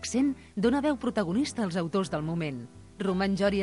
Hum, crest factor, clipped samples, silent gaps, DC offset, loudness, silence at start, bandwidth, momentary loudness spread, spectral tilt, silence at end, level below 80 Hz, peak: none; 14 dB; under 0.1%; none; under 0.1%; -29 LUFS; 0 s; 11.5 kHz; 8 LU; -5.5 dB/octave; 0 s; -52 dBFS; -14 dBFS